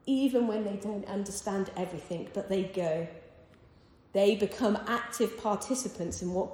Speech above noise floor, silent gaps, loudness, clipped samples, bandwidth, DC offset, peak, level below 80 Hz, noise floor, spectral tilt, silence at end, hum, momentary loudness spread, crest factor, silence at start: 28 dB; none; -32 LUFS; under 0.1%; 18 kHz; under 0.1%; -14 dBFS; -62 dBFS; -59 dBFS; -5 dB/octave; 0 s; none; 10 LU; 18 dB; 0.05 s